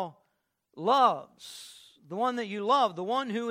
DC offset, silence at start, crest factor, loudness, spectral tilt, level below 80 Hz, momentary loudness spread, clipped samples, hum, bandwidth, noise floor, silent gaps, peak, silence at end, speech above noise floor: under 0.1%; 0 s; 20 dB; -28 LUFS; -4.5 dB/octave; -84 dBFS; 21 LU; under 0.1%; none; 15.5 kHz; -78 dBFS; none; -10 dBFS; 0 s; 50 dB